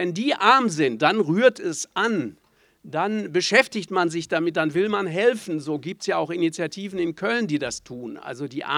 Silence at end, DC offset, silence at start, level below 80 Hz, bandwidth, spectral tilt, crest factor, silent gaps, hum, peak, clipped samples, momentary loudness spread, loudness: 0 s; under 0.1%; 0 s; -66 dBFS; 14.5 kHz; -4.5 dB/octave; 20 dB; none; none; -2 dBFS; under 0.1%; 13 LU; -23 LUFS